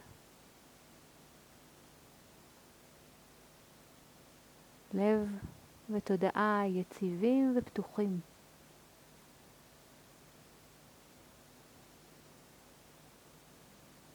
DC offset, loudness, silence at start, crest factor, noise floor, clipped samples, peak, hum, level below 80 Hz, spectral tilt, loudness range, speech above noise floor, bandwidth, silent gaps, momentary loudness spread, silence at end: under 0.1%; -34 LUFS; 4.9 s; 22 dB; -60 dBFS; under 0.1%; -18 dBFS; none; -70 dBFS; -7 dB/octave; 25 LU; 28 dB; over 20 kHz; none; 28 LU; 5.9 s